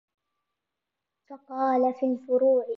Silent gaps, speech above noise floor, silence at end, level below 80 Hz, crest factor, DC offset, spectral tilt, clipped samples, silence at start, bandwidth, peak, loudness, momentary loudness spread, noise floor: none; 61 dB; 0.05 s; -86 dBFS; 14 dB; under 0.1%; -7.5 dB/octave; under 0.1%; 1.3 s; 5.6 kHz; -14 dBFS; -25 LUFS; 7 LU; -86 dBFS